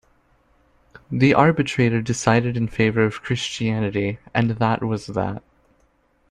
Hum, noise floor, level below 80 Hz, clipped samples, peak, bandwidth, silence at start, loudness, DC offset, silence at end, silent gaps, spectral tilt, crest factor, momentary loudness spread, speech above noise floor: none; -62 dBFS; -50 dBFS; under 0.1%; -2 dBFS; 10.5 kHz; 1.1 s; -21 LUFS; under 0.1%; 0.9 s; none; -6 dB/octave; 20 dB; 9 LU; 42 dB